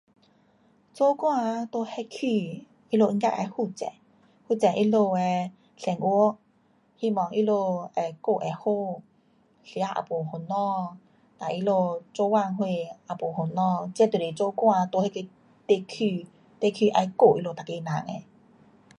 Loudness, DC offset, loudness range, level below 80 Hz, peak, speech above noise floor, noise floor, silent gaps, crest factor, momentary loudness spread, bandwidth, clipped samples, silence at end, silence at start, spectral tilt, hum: -26 LUFS; under 0.1%; 4 LU; -74 dBFS; -6 dBFS; 39 dB; -64 dBFS; none; 20 dB; 13 LU; 11.5 kHz; under 0.1%; 0.75 s; 0.95 s; -7 dB/octave; none